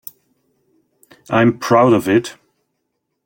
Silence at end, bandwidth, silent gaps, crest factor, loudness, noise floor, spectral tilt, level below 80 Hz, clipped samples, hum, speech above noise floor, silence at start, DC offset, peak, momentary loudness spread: 0.95 s; 17 kHz; none; 16 dB; -15 LUFS; -73 dBFS; -6.5 dB/octave; -58 dBFS; under 0.1%; none; 59 dB; 1.3 s; under 0.1%; -2 dBFS; 17 LU